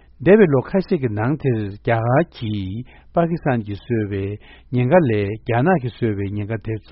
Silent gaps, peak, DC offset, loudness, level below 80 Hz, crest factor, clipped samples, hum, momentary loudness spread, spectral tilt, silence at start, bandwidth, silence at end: none; 0 dBFS; under 0.1%; -20 LUFS; -46 dBFS; 20 dB; under 0.1%; none; 11 LU; -7.5 dB/octave; 0.2 s; 5.8 kHz; 0.15 s